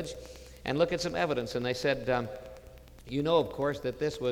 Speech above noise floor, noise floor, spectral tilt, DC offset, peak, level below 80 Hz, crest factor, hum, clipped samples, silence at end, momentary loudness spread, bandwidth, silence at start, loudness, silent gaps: 20 dB; -51 dBFS; -5.5 dB/octave; under 0.1%; -14 dBFS; -54 dBFS; 18 dB; none; under 0.1%; 0 s; 17 LU; 17 kHz; 0 s; -31 LUFS; none